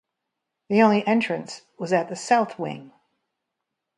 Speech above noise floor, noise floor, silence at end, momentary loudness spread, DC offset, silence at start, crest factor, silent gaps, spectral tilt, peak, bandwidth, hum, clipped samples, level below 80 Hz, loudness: 60 dB; -82 dBFS; 1.1 s; 16 LU; under 0.1%; 0.7 s; 22 dB; none; -5.5 dB/octave; -4 dBFS; 11 kHz; none; under 0.1%; -74 dBFS; -23 LUFS